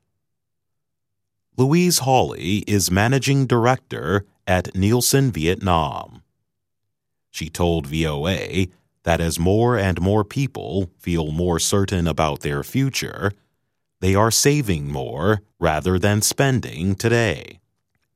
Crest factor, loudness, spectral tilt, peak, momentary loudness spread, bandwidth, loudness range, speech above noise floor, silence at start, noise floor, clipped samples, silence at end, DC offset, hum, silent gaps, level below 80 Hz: 20 dB; -20 LUFS; -5 dB/octave; 0 dBFS; 9 LU; 16 kHz; 4 LU; 62 dB; 1.6 s; -82 dBFS; under 0.1%; 0.65 s; under 0.1%; none; none; -40 dBFS